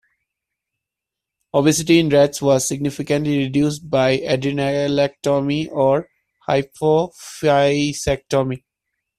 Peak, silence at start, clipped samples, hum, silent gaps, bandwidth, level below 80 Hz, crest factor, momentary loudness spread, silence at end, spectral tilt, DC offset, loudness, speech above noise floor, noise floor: -2 dBFS; 1.55 s; under 0.1%; none; none; 14 kHz; -50 dBFS; 16 dB; 7 LU; 0.6 s; -5 dB/octave; under 0.1%; -18 LUFS; 67 dB; -84 dBFS